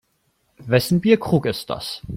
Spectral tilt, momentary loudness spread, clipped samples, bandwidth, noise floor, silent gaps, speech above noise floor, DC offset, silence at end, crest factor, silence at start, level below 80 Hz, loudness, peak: -6 dB/octave; 11 LU; under 0.1%; 16.5 kHz; -67 dBFS; none; 48 dB; under 0.1%; 0 s; 18 dB; 0.6 s; -50 dBFS; -20 LUFS; -4 dBFS